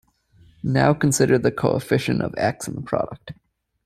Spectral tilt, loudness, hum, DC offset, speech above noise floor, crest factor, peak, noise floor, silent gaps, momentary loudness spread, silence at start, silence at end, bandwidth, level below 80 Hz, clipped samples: -5.5 dB/octave; -21 LUFS; none; under 0.1%; 34 dB; 20 dB; -4 dBFS; -55 dBFS; none; 13 LU; 0.65 s; 0.55 s; 14.5 kHz; -52 dBFS; under 0.1%